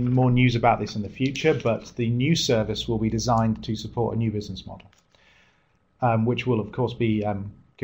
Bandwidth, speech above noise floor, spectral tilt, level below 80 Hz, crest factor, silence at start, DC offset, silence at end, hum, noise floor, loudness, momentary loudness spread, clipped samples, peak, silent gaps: 16 kHz; 41 dB; -6 dB/octave; -46 dBFS; 20 dB; 0 s; under 0.1%; 0.3 s; none; -65 dBFS; -24 LUFS; 11 LU; under 0.1%; -4 dBFS; none